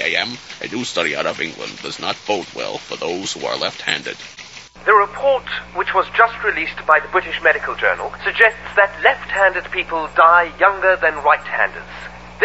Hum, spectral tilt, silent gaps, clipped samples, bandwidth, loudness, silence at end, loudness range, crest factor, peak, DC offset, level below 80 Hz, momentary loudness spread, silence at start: none; -2.5 dB/octave; none; under 0.1%; 8 kHz; -17 LUFS; 0 s; 8 LU; 18 dB; 0 dBFS; under 0.1%; -48 dBFS; 13 LU; 0 s